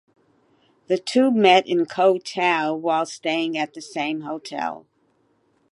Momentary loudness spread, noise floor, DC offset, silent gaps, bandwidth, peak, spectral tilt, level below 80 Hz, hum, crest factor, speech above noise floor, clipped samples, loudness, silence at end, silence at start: 13 LU; -65 dBFS; under 0.1%; none; 11.5 kHz; -2 dBFS; -4.5 dB/octave; -78 dBFS; none; 20 dB; 44 dB; under 0.1%; -21 LUFS; 0.95 s; 0.9 s